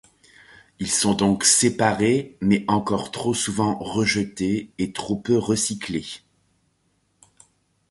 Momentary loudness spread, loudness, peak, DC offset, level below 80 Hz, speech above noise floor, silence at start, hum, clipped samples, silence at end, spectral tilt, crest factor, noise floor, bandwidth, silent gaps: 12 LU; -22 LUFS; -4 dBFS; under 0.1%; -52 dBFS; 46 dB; 0.8 s; none; under 0.1%; 1.75 s; -3.5 dB/octave; 20 dB; -68 dBFS; 11.5 kHz; none